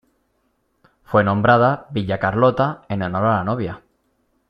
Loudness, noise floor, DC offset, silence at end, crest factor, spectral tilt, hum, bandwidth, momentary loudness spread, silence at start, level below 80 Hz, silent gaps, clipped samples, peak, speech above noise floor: -19 LUFS; -67 dBFS; under 0.1%; 0.7 s; 18 dB; -9.5 dB/octave; none; 5.8 kHz; 11 LU; 1.1 s; -52 dBFS; none; under 0.1%; -2 dBFS; 49 dB